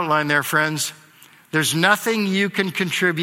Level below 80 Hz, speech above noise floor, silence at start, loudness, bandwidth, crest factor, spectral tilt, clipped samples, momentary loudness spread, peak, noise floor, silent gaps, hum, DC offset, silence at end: -66 dBFS; 30 dB; 0 s; -19 LUFS; 16.5 kHz; 20 dB; -3.5 dB/octave; under 0.1%; 6 LU; 0 dBFS; -50 dBFS; none; none; under 0.1%; 0 s